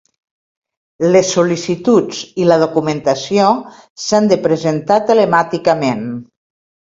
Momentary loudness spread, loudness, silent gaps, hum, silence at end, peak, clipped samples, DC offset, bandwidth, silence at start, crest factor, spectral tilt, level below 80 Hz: 8 LU; -14 LUFS; 3.90-3.96 s; none; 0.6 s; 0 dBFS; under 0.1%; under 0.1%; 7.8 kHz; 1 s; 14 dB; -5 dB/octave; -56 dBFS